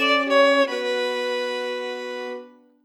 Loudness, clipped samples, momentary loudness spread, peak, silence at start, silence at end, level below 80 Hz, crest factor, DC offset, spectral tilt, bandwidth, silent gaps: -22 LUFS; under 0.1%; 15 LU; -8 dBFS; 0 s; 0.35 s; under -90 dBFS; 16 dB; under 0.1%; -1 dB/octave; 13.5 kHz; none